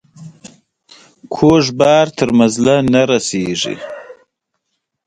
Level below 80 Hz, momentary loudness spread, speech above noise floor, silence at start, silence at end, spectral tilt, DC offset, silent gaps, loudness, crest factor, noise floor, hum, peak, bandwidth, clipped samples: -48 dBFS; 16 LU; 60 dB; 0.2 s; 0.95 s; -5 dB/octave; under 0.1%; none; -13 LUFS; 16 dB; -73 dBFS; none; 0 dBFS; 10.5 kHz; under 0.1%